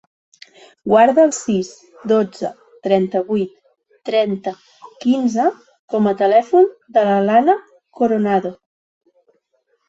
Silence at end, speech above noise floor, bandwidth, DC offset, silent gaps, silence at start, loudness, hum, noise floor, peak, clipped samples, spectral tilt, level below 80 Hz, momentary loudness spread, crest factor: 1.35 s; 50 dB; 8 kHz; under 0.1%; 5.79-5.88 s; 0.85 s; -17 LUFS; none; -66 dBFS; -2 dBFS; under 0.1%; -6 dB/octave; -64 dBFS; 15 LU; 16 dB